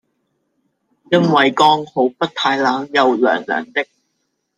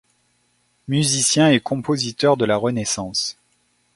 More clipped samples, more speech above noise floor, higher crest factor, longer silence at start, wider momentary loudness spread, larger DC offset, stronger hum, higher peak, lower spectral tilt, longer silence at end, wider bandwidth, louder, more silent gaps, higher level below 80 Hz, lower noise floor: neither; first, 55 dB vs 46 dB; about the same, 16 dB vs 18 dB; first, 1.1 s vs 0.9 s; about the same, 8 LU vs 8 LU; neither; neither; about the same, 0 dBFS vs -2 dBFS; about the same, -5 dB/octave vs -4 dB/octave; about the same, 0.75 s vs 0.65 s; second, 10 kHz vs 12 kHz; first, -16 LUFS vs -19 LUFS; neither; second, -66 dBFS vs -56 dBFS; first, -71 dBFS vs -65 dBFS